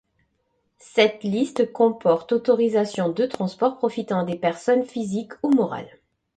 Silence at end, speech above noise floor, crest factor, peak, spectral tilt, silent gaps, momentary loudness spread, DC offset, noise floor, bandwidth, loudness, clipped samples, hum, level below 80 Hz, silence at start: 0.5 s; 49 dB; 20 dB; -2 dBFS; -6 dB/octave; none; 7 LU; under 0.1%; -71 dBFS; 9.2 kHz; -22 LUFS; under 0.1%; none; -66 dBFS; 0.95 s